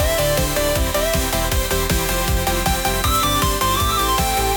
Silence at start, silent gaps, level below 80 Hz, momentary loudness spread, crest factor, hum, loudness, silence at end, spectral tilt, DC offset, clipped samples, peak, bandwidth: 0 s; none; -26 dBFS; 2 LU; 12 dB; none; -18 LUFS; 0 s; -3.5 dB/octave; under 0.1%; under 0.1%; -6 dBFS; 19.5 kHz